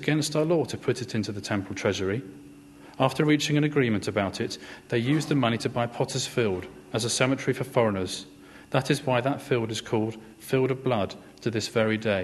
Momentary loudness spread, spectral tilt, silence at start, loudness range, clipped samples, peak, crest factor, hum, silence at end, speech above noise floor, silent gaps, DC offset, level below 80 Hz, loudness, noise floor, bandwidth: 9 LU; -5 dB/octave; 0 s; 2 LU; under 0.1%; -6 dBFS; 22 dB; none; 0 s; 22 dB; none; under 0.1%; -62 dBFS; -27 LUFS; -48 dBFS; 13 kHz